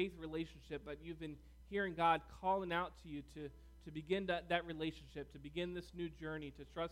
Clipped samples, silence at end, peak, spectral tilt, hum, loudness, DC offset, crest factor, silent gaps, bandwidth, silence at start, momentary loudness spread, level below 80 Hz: under 0.1%; 0 s; -22 dBFS; -6 dB/octave; none; -43 LUFS; under 0.1%; 20 dB; none; 16 kHz; 0 s; 15 LU; -60 dBFS